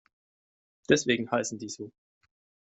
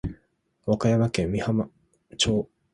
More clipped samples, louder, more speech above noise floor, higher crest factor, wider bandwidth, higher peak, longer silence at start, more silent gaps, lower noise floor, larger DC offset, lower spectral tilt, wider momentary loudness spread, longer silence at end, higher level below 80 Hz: neither; second, -28 LUFS vs -25 LUFS; first, over 62 dB vs 44 dB; first, 24 dB vs 18 dB; second, 8.2 kHz vs 11.5 kHz; about the same, -8 dBFS vs -8 dBFS; first, 0.9 s vs 0.05 s; neither; first, under -90 dBFS vs -68 dBFS; neither; second, -3.5 dB/octave vs -5.5 dB/octave; first, 19 LU vs 14 LU; first, 0.7 s vs 0.3 s; second, -66 dBFS vs -46 dBFS